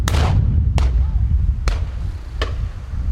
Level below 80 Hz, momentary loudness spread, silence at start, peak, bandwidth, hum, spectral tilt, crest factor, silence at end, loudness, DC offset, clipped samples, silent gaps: -20 dBFS; 10 LU; 0 s; -4 dBFS; 12 kHz; none; -6 dB/octave; 14 dB; 0 s; -20 LUFS; under 0.1%; under 0.1%; none